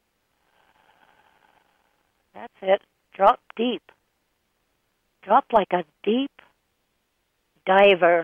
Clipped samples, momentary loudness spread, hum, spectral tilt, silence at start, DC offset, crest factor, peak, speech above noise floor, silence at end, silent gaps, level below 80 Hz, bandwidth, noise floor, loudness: under 0.1%; 17 LU; none; -7 dB/octave; 2.35 s; under 0.1%; 20 dB; -4 dBFS; 52 dB; 0 s; none; -64 dBFS; 4.8 kHz; -73 dBFS; -21 LUFS